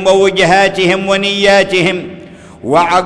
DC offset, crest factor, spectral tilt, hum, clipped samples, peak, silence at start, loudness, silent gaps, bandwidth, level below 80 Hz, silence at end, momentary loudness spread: under 0.1%; 10 dB; -4 dB/octave; none; under 0.1%; 0 dBFS; 0 s; -10 LUFS; none; 11 kHz; -42 dBFS; 0 s; 10 LU